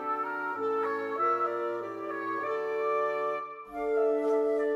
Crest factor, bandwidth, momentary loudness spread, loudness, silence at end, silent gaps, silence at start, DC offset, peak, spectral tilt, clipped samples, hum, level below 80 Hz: 12 dB; 7.4 kHz; 8 LU; -30 LUFS; 0 s; none; 0 s; under 0.1%; -18 dBFS; -5.5 dB/octave; under 0.1%; none; -70 dBFS